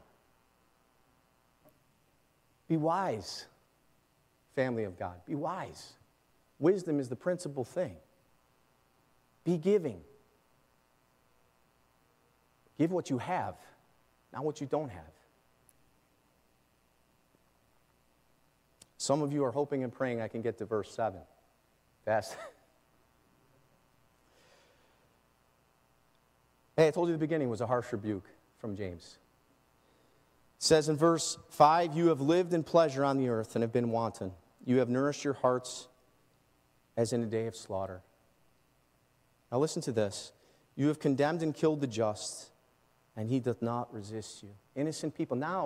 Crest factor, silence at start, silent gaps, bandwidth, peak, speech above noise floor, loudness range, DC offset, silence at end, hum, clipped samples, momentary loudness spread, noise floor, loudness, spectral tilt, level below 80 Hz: 26 dB; 2.7 s; none; 15.5 kHz; -10 dBFS; 39 dB; 11 LU; under 0.1%; 0 s; none; under 0.1%; 16 LU; -71 dBFS; -32 LUFS; -5.5 dB/octave; -74 dBFS